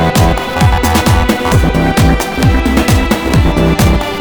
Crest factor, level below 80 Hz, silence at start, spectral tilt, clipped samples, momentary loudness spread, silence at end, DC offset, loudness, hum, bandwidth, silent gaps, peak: 10 dB; -16 dBFS; 0 s; -5.5 dB/octave; under 0.1%; 2 LU; 0 s; 0.9%; -11 LUFS; none; over 20 kHz; none; 0 dBFS